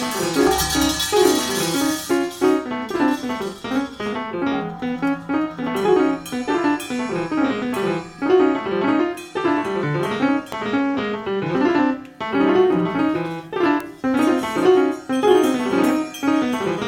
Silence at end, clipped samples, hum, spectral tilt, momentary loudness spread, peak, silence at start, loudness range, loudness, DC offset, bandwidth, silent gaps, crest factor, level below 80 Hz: 0 s; under 0.1%; none; -4.5 dB/octave; 8 LU; -4 dBFS; 0 s; 4 LU; -20 LUFS; under 0.1%; 17 kHz; none; 16 dB; -48 dBFS